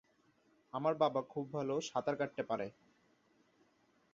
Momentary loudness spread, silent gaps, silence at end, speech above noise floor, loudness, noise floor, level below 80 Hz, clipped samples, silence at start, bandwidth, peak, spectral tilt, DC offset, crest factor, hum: 8 LU; none; 1.4 s; 36 dB; -38 LUFS; -73 dBFS; -80 dBFS; under 0.1%; 0.75 s; 7.4 kHz; -18 dBFS; -4.5 dB/octave; under 0.1%; 22 dB; none